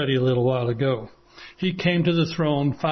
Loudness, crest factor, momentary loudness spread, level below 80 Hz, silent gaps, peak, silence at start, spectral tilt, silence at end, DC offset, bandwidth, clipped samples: -23 LUFS; 16 dB; 7 LU; -54 dBFS; none; -8 dBFS; 0 s; -7.5 dB/octave; 0 s; under 0.1%; 6.4 kHz; under 0.1%